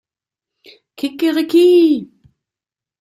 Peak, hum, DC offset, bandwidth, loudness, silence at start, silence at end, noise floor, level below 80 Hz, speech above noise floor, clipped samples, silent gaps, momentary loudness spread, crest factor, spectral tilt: -2 dBFS; none; under 0.1%; 13.5 kHz; -14 LUFS; 1 s; 0.95 s; -89 dBFS; -68 dBFS; 76 dB; under 0.1%; none; 14 LU; 14 dB; -5 dB/octave